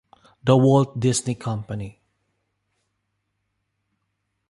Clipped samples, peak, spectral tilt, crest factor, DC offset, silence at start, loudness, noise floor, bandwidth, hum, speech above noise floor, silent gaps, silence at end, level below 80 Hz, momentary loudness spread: under 0.1%; -4 dBFS; -6.5 dB/octave; 22 dB; under 0.1%; 0.45 s; -21 LUFS; -76 dBFS; 11.5 kHz; none; 56 dB; none; 2.6 s; -56 dBFS; 17 LU